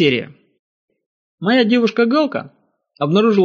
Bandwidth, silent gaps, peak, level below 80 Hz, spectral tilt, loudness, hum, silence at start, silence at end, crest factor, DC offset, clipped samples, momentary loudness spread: 7 kHz; 0.59-0.88 s, 1.06-1.38 s; -2 dBFS; -64 dBFS; -4 dB/octave; -16 LUFS; none; 0 s; 0 s; 14 dB; under 0.1%; under 0.1%; 11 LU